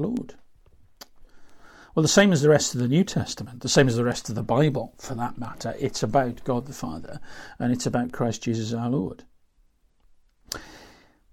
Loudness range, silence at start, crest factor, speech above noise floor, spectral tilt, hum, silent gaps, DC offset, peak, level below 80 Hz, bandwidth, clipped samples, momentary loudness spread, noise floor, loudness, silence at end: 8 LU; 0 s; 20 dB; 38 dB; -5 dB/octave; none; none; under 0.1%; -6 dBFS; -50 dBFS; 16 kHz; under 0.1%; 17 LU; -62 dBFS; -24 LUFS; 0.45 s